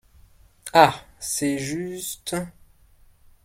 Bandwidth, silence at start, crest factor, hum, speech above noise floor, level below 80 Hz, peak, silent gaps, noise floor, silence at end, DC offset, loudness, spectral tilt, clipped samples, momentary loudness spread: 16.5 kHz; 0.65 s; 24 dB; none; 33 dB; -56 dBFS; 0 dBFS; none; -55 dBFS; 0.95 s; under 0.1%; -23 LUFS; -3.5 dB/octave; under 0.1%; 16 LU